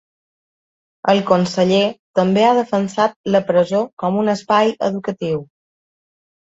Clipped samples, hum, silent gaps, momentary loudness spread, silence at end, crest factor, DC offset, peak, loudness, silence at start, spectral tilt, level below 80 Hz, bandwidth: under 0.1%; none; 1.99-2.14 s, 3.16-3.24 s, 3.93-3.97 s; 8 LU; 1.05 s; 16 dB; under 0.1%; -2 dBFS; -17 LUFS; 1.05 s; -6 dB/octave; -60 dBFS; 8 kHz